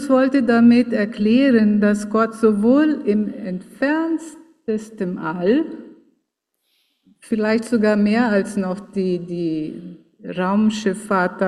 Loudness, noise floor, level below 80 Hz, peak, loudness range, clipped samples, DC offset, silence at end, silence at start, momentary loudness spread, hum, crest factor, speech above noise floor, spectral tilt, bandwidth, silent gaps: -19 LUFS; -74 dBFS; -60 dBFS; -4 dBFS; 8 LU; under 0.1%; under 0.1%; 0 s; 0 s; 13 LU; none; 14 dB; 56 dB; -6.5 dB/octave; 11.5 kHz; none